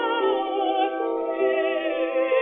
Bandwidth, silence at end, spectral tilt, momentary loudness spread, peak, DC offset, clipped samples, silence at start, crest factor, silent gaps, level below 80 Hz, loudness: 3.9 kHz; 0 s; 1.5 dB/octave; 3 LU; -10 dBFS; under 0.1%; under 0.1%; 0 s; 12 dB; none; -68 dBFS; -24 LUFS